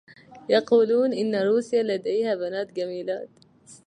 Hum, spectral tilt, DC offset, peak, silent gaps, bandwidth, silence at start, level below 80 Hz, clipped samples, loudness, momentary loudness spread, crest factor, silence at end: none; -5.5 dB/octave; under 0.1%; -8 dBFS; none; 10 kHz; 0.3 s; -76 dBFS; under 0.1%; -24 LUFS; 12 LU; 16 dB; 0.1 s